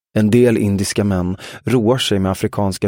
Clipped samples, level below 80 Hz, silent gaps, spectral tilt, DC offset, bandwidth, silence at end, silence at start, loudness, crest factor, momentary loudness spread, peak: under 0.1%; -46 dBFS; none; -6 dB/octave; under 0.1%; 16.5 kHz; 0 s; 0.15 s; -16 LUFS; 14 dB; 7 LU; -2 dBFS